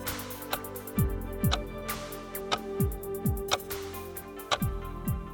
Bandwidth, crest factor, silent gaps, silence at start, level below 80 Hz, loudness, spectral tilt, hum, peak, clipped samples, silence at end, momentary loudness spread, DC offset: 18 kHz; 22 dB; none; 0 s; -40 dBFS; -33 LUFS; -4.5 dB/octave; none; -10 dBFS; under 0.1%; 0 s; 8 LU; under 0.1%